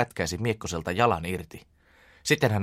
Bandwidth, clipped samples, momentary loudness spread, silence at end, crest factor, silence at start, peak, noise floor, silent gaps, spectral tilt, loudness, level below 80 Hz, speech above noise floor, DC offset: 16 kHz; under 0.1%; 11 LU; 0 s; 20 dB; 0 s; -8 dBFS; -58 dBFS; none; -5 dB/octave; -27 LUFS; -50 dBFS; 31 dB; under 0.1%